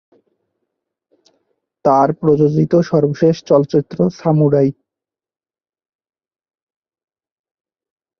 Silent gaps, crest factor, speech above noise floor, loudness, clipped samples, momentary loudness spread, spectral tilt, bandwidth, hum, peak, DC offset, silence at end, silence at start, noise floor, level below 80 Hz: none; 18 dB; 74 dB; -15 LUFS; under 0.1%; 5 LU; -9 dB/octave; 6.6 kHz; none; 0 dBFS; under 0.1%; 3.45 s; 1.85 s; -87 dBFS; -56 dBFS